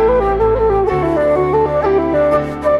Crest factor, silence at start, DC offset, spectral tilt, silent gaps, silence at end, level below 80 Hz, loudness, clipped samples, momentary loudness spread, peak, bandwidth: 10 dB; 0 s; under 0.1%; -8.5 dB/octave; none; 0 s; -30 dBFS; -14 LUFS; under 0.1%; 2 LU; -2 dBFS; 11.5 kHz